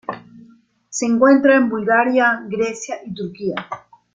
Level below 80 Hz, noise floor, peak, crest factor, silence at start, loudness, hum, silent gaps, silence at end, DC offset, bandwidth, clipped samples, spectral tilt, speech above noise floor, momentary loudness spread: -62 dBFS; -50 dBFS; -2 dBFS; 16 dB; 0.1 s; -17 LUFS; none; none; 0.35 s; under 0.1%; 9.4 kHz; under 0.1%; -4.5 dB/octave; 33 dB; 18 LU